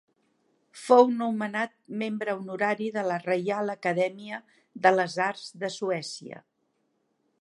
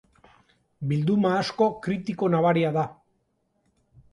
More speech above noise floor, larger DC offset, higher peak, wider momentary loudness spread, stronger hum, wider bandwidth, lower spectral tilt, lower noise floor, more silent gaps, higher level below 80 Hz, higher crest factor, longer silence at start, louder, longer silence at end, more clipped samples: about the same, 47 dB vs 48 dB; neither; first, -4 dBFS vs -10 dBFS; first, 17 LU vs 8 LU; neither; about the same, 11.5 kHz vs 11 kHz; second, -5 dB/octave vs -7.5 dB/octave; about the same, -74 dBFS vs -72 dBFS; neither; second, -84 dBFS vs -64 dBFS; first, 24 dB vs 16 dB; about the same, 0.75 s vs 0.8 s; about the same, -27 LUFS vs -25 LUFS; second, 1 s vs 1.2 s; neither